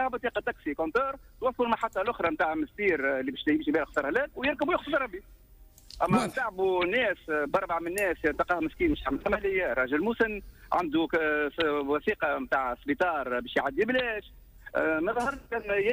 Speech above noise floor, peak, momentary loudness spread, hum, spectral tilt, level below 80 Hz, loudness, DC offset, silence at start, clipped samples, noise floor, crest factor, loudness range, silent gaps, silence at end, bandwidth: 26 dB; -14 dBFS; 5 LU; none; -5.5 dB/octave; -52 dBFS; -29 LUFS; under 0.1%; 0 s; under 0.1%; -55 dBFS; 14 dB; 1 LU; none; 0 s; 15.5 kHz